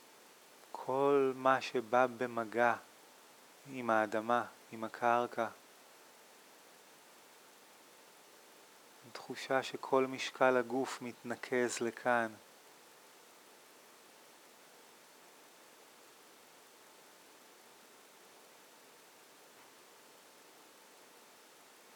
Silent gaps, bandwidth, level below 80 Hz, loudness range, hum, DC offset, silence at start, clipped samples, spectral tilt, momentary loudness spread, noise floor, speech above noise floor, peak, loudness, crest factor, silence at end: none; 19.5 kHz; under -90 dBFS; 24 LU; none; under 0.1%; 0.75 s; under 0.1%; -4 dB/octave; 26 LU; -60 dBFS; 26 dB; -14 dBFS; -35 LUFS; 24 dB; 9.55 s